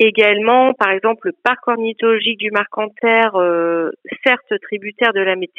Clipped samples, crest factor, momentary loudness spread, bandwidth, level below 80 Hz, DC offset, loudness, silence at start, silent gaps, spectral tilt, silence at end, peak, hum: under 0.1%; 16 dB; 8 LU; 5.4 kHz; -72 dBFS; under 0.1%; -16 LUFS; 0 s; none; -6 dB/octave; 0.15 s; 0 dBFS; none